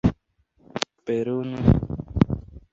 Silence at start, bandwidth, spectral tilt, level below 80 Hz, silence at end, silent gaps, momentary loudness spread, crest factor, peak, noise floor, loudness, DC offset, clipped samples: 0.05 s; 8 kHz; -7.5 dB/octave; -34 dBFS; 0.15 s; none; 10 LU; 22 dB; -2 dBFS; -64 dBFS; -25 LUFS; under 0.1%; under 0.1%